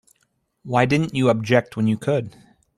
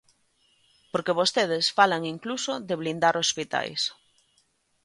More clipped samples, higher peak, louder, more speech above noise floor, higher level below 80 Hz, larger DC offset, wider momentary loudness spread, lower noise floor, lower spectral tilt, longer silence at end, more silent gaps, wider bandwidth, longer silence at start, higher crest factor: neither; first, -2 dBFS vs -6 dBFS; first, -20 LUFS vs -25 LUFS; first, 49 dB vs 43 dB; first, -56 dBFS vs -72 dBFS; neither; second, 6 LU vs 9 LU; about the same, -69 dBFS vs -69 dBFS; first, -7 dB/octave vs -2.5 dB/octave; second, 0.5 s vs 0.9 s; neither; about the same, 12.5 kHz vs 11.5 kHz; second, 0.65 s vs 0.95 s; about the same, 18 dB vs 22 dB